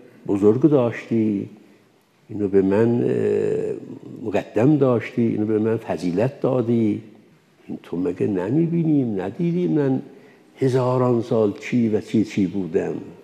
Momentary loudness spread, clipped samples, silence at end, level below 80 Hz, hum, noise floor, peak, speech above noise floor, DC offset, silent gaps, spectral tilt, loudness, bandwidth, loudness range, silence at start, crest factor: 10 LU; under 0.1%; 0 s; -68 dBFS; none; -57 dBFS; -4 dBFS; 37 dB; under 0.1%; none; -9 dB/octave; -21 LUFS; 10 kHz; 2 LU; 0.25 s; 18 dB